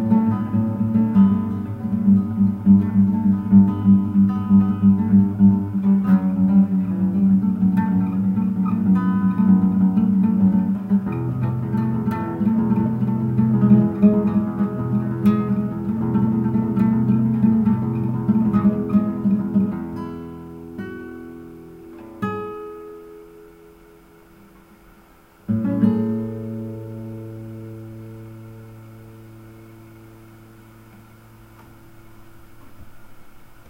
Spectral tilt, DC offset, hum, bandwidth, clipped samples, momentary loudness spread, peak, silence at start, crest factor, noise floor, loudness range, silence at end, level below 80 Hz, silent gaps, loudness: -11 dB/octave; under 0.1%; none; 3.2 kHz; under 0.1%; 20 LU; -2 dBFS; 0 s; 16 dB; -50 dBFS; 18 LU; 0.05 s; -50 dBFS; none; -19 LUFS